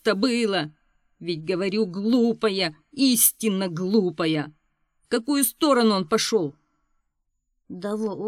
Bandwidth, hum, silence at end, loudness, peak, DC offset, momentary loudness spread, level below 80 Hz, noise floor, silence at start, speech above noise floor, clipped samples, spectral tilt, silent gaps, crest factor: 18 kHz; none; 0 s; -23 LUFS; -4 dBFS; under 0.1%; 13 LU; -68 dBFS; -75 dBFS; 0.05 s; 52 dB; under 0.1%; -3.5 dB/octave; none; 20 dB